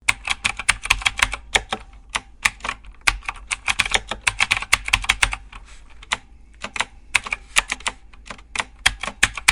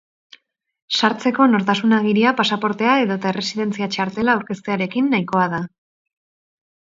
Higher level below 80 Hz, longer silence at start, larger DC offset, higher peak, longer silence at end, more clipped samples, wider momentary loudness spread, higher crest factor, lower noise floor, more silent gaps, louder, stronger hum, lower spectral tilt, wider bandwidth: first, -38 dBFS vs -62 dBFS; second, 0.1 s vs 0.9 s; neither; about the same, 0 dBFS vs 0 dBFS; second, 0 s vs 1.25 s; neither; first, 12 LU vs 7 LU; about the same, 24 dB vs 20 dB; second, -42 dBFS vs -51 dBFS; neither; about the same, -21 LUFS vs -19 LUFS; neither; second, 0 dB/octave vs -5.5 dB/octave; first, over 20 kHz vs 7.8 kHz